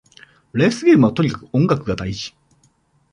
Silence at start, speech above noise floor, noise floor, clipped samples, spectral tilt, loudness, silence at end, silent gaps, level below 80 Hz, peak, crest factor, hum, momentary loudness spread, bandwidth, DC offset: 0.55 s; 43 dB; -60 dBFS; under 0.1%; -7 dB/octave; -18 LUFS; 0.85 s; none; -46 dBFS; -4 dBFS; 16 dB; none; 14 LU; 10.5 kHz; under 0.1%